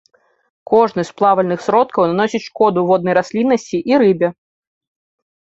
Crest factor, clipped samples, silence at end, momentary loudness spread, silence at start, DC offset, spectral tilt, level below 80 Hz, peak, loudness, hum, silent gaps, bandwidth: 16 dB; under 0.1%; 1.25 s; 5 LU; 0.7 s; under 0.1%; -6.5 dB/octave; -60 dBFS; -2 dBFS; -15 LUFS; none; none; 8 kHz